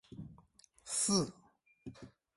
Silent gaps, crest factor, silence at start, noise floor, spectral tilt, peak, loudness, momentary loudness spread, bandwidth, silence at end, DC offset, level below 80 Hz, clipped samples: none; 22 dB; 0.1 s; -66 dBFS; -3.5 dB/octave; -18 dBFS; -34 LUFS; 24 LU; 11.5 kHz; 0.3 s; under 0.1%; -68 dBFS; under 0.1%